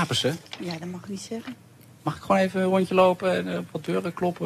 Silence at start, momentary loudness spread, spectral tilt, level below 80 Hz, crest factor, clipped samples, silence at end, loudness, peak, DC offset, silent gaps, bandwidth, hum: 0 s; 15 LU; -5.5 dB/octave; -62 dBFS; 18 dB; under 0.1%; 0 s; -26 LUFS; -8 dBFS; under 0.1%; none; 14.5 kHz; none